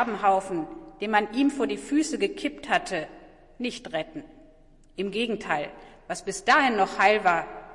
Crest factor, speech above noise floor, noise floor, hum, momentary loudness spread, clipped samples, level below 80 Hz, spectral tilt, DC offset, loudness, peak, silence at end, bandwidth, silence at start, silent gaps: 20 dB; 28 dB; -54 dBFS; none; 15 LU; under 0.1%; -56 dBFS; -3.5 dB/octave; under 0.1%; -26 LUFS; -8 dBFS; 0 s; 11.5 kHz; 0 s; none